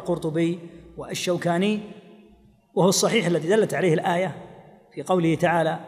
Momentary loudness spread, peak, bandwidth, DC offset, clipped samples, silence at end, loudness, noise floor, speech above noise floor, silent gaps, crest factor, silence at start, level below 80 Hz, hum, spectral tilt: 18 LU; -8 dBFS; 15.5 kHz; under 0.1%; under 0.1%; 0 s; -23 LUFS; -55 dBFS; 32 dB; none; 16 dB; 0 s; -60 dBFS; none; -5 dB/octave